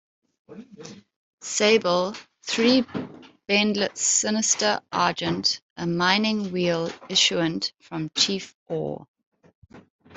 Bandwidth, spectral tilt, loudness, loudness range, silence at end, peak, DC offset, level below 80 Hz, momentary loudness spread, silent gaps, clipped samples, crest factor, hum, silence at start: 8.2 kHz; -2.5 dB/octave; -23 LUFS; 3 LU; 0 s; -4 dBFS; under 0.1%; -66 dBFS; 16 LU; 1.16-1.38 s, 5.62-5.76 s, 8.54-8.66 s, 9.08-9.14 s, 9.26-9.32 s, 9.55-9.62 s, 9.90-9.99 s; under 0.1%; 20 dB; none; 0.5 s